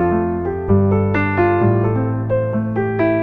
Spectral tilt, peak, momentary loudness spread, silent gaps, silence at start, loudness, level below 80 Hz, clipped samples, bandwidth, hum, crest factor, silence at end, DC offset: -11 dB/octave; -4 dBFS; 5 LU; none; 0 s; -17 LUFS; -38 dBFS; under 0.1%; 4.4 kHz; none; 12 dB; 0 s; under 0.1%